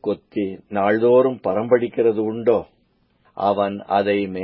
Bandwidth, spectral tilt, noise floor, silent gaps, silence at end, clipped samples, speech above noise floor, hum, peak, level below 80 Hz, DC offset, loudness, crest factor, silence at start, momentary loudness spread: 5.2 kHz; -11.5 dB/octave; -62 dBFS; none; 0 s; under 0.1%; 43 dB; none; -4 dBFS; -58 dBFS; under 0.1%; -20 LUFS; 16 dB; 0.05 s; 10 LU